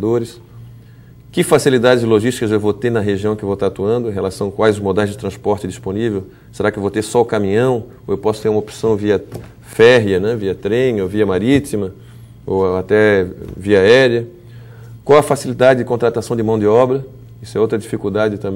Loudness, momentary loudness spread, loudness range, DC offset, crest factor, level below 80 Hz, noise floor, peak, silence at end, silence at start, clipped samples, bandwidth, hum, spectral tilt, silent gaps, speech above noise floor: -15 LUFS; 11 LU; 4 LU; under 0.1%; 16 dB; -46 dBFS; -40 dBFS; 0 dBFS; 0 s; 0 s; under 0.1%; 16.5 kHz; none; -6 dB/octave; none; 25 dB